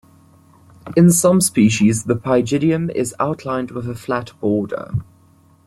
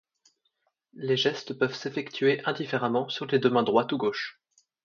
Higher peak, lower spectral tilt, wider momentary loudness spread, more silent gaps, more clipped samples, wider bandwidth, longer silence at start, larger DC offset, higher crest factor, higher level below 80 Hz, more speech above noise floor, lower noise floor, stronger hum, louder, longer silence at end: first, -2 dBFS vs -6 dBFS; about the same, -5.5 dB/octave vs -5.5 dB/octave; first, 12 LU vs 9 LU; neither; neither; first, 15.5 kHz vs 7.2 kHz; about the same, 0.85 s vs 0.95 s; neither; second, 16 dB vs 22 dB; first, -50 dBFS vs -74 dBFS; second, 35 dB vs 49 dB; second, -52 dBFS vs -76 dBFS; neither; first, -17 LUFS vs -27 LUFS; about the same, 0.65 s vs 0.55 s